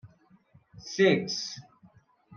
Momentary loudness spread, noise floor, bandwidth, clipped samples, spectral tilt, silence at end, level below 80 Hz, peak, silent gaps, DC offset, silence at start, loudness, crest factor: 21 LU; -61 dBFS; 7.2 kHz; under 0.1%; -4.5 dB/octave; 0 s; -72 dBFS; -10 dBFS; none; under 0.1%; 0.05 s; -27 LUFS; 20 dB